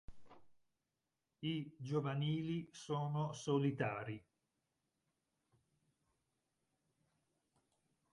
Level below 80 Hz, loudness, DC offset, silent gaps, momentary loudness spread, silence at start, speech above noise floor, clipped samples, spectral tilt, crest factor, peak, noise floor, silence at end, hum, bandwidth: -74 dBFS; -41 LUFS; under 0.1%; none; 9 LU; 0.1 s; over 50 dB; under 0.1%; -6.5 dB/octave; 20 dB; -24 dBFS; under -90 dBFS; 3.95 s; none; 11 kHz